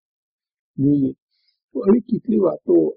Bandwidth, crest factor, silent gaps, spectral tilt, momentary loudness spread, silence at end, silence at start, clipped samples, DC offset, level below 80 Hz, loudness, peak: 4.4 kHz; 14 dB; 1.22-1.29 s, 1.64-1.69 s; -11.5 dB/octave; 9 LU; 0.05 s; 0.8 s; under 0.1%; under 0.1%; -56 dBFS; -19 LUFS; -6 dBFS